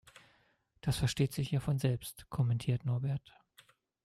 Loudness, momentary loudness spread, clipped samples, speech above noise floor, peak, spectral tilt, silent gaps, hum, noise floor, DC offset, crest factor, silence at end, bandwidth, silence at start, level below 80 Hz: -35 LUFS; 8 LU; under 0.1%; 39 dB; -18 dBFS; -6 dB/octave; none; none; -72 dBFS; under 0.1%; 18 dB; 0.85 s; 15.5 kHz; 0.85 s; -56 dBFS